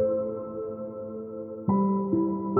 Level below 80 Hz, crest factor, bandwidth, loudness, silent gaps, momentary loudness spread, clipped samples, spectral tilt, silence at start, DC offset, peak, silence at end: -62 dBFS; 16 dB; 2.1 kHz; -29 LUFS; none; 12 LU; under 0.1%; -15.5 dB/octave; 0 s; under 0.1%; -12 dBFS; 0 s